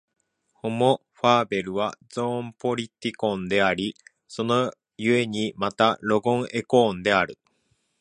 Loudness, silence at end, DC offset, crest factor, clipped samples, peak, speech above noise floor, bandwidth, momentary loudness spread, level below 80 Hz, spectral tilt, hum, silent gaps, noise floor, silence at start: -24 LUFS; 0.65 s; under 0.1%; 22 dB; under 0.1%; -4 dBFS; 47 dB; 11 kHz; 9 LU; -60 dBFS; -5.5 dB/octave; none; none; -70 dBFS; 0.65 s